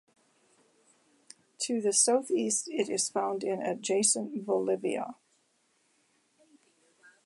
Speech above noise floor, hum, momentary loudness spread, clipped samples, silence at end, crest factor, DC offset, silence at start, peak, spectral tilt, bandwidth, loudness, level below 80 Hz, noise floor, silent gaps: 42 dB; none; 9 LU; under 0.1%; 2.1 s; 20 dB; under 0.1%; 1.6 s; -12 dBFS; -2.5 dB/octave; 11.5 kHz; -29 LUFS; -86 dBFS; -72 dBFS; none